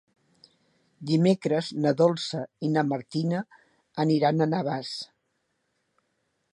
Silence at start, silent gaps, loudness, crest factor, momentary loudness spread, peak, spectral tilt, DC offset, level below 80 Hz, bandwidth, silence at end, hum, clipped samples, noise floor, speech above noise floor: 1 s; none; -26 LUFS; 20 dB; 14 LU; -8 dBFS; -7 dB/octave; under 0.1%; -74 dBFS; 11 kHz; 1.5 s; none; under 0.1%; -76 dBFS; 51 dB